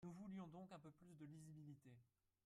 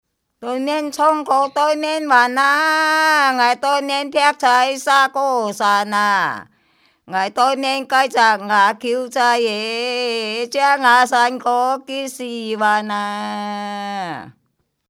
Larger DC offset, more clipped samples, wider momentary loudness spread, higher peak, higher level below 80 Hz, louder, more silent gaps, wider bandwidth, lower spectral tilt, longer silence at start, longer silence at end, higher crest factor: neither; neither; second, 8 LU vs 11 LU; second, -46 dBFS vs 0 dBFS; second, -88 dBFS vs -74 dBFS; second, -60 LUFS vs -17 LUFS; neither; second, 13 kHz vs 16.5 kHz; first, -7.5 dB/octave vs -2.5 dB/octave; second, 0 s vs 0.4 s; second, 0.4 s vs 0.6 s; about the same, 14 dB vs 18 dB